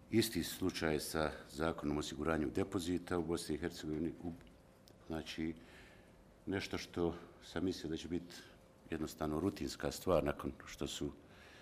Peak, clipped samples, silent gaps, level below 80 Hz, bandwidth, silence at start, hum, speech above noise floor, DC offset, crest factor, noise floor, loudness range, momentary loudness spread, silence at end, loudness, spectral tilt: -20 dBFS; under 0.1%; none; -58 dBFS; 15.5 kHz; 0 s; none; 23 dB; under 0.1%; 22 dB; -62 dBFS; 6 LU; 16 LU; 0 s; -40 LUFS; -5 dB/octave